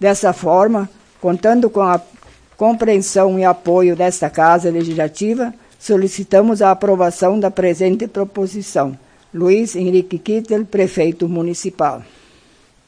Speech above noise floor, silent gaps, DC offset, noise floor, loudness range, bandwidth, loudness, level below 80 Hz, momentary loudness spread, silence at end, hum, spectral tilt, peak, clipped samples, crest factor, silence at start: 36 dB; none; under 0.1%; -51 dBFS; 3 LU; 10.5 kHz; -15 LUFS; -54 dBFS; 8 LU; 0.85 s; none; -6 dB/octave; 0 dBFS; under 0.1%; 16 dB; 0 s